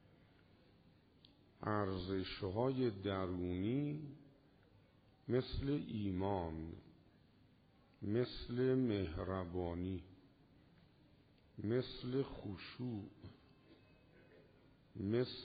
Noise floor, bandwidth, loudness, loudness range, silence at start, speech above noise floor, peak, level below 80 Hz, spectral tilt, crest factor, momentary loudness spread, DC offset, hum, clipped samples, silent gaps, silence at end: -69 dBFS; 4.9 kHz; -41 LUFS; 5 LU; 1.6 s; 29 dB; -24 dBFS; -62 dBFS; -6.5 dB/octave; 18 dB; 15 LU; under 0.1%; none; under 0.1%; none; 0 s